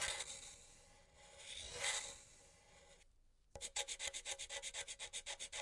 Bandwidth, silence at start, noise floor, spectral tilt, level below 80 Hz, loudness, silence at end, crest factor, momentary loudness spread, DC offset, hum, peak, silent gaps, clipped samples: 12 kHz; 0 s; -71 dBFS; 1 dB/octave; -68 dBFS; -45 LUFS; 0 s; 26 dB; 23 LU; under 0.1%; none; -24 dBFS; none; under 0.1%